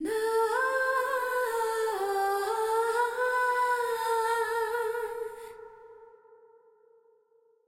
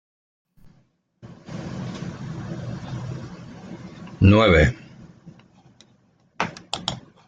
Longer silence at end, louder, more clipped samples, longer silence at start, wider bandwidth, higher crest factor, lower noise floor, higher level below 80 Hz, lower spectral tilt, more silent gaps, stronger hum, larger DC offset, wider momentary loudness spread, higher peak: first, 1.6 s vs 0.3 s; second, -28 LUFS vs -22 LUFS; neither; second, 0 s vs 0.65 s; first, 16.5 kHz vs 9.2 kHz; second, 12 dB vs 22 dB; first, -66 dBFS vs -62 dBFS; second, -70 dBFS vs -40 dBFS; second, -1.5 dB/octave vs -6.5 dB/octave; neither; neither; neither; second, 10 LU vs 24 LU; second, -18 dBFS vs -4 dBFS